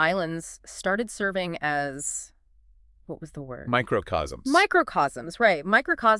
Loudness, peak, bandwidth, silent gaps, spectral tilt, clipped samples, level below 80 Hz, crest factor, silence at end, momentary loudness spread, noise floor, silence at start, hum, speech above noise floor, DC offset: -25 LUFS; -6 dBFS; 12 kHz; none; -4 dB/octave; under 0.1%; -52 dBFS; 20 dB; 0 s; 18 LU; -58 dBFS; 0 s; none; 32 dB; under 0.1%